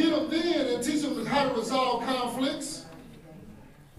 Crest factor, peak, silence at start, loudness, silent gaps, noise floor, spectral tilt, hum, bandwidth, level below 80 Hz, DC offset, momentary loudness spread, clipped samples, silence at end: 16 dB; -12 dBFS; 0 s; -28 LUFS; none; -50 dBFS; -4 dB/octave; none; 15 kHz; -56 dBFS; under 0.1%; 22 LU; under 0.1%; 0.15 s